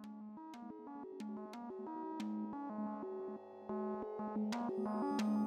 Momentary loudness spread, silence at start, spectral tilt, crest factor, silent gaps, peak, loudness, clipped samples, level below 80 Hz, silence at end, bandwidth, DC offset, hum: 12 LU; 0 s; -7 dB/octave; 14 dB; none; -28 dBFS; -44 LUFS; under 0.1%; -82 dBFS; 0 s; 12.5 kHz; under 0.1%; none